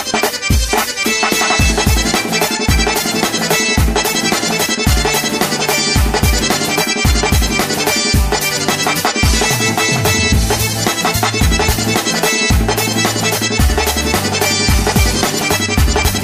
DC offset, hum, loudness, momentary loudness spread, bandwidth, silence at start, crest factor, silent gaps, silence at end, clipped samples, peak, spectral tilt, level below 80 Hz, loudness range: under 0.1%; none; -13 LUFS; 2 LU; 16 kHz; 0 s; 14 dB; none; 0 s; under 0.1%; 0 dBFS; -3 dB/octave; -20 dBFS; 0 LU